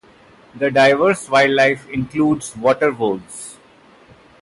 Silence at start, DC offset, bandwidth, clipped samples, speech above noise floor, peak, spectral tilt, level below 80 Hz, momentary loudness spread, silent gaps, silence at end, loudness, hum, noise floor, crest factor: 0.55 s; under 0.1%; 11.5 kHz; under 0.1%; 32 dB; -4 dBFS; -4.5 dB/octave; -54 dBFS; 14 LU; none; 0.9 s; -16 LUFS; none; -48 dBFS; 14 dB